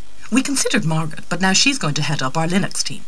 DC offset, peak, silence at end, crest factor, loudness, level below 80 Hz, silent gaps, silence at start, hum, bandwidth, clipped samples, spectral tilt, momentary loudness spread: 7%; -2 dBFS; 0.05 s; 18 dB; -18 LUFS; -50 dBFS; none; 0.2 s; none; 11 kHz; under 0.1%; -3.5 dB/octave; 8 LU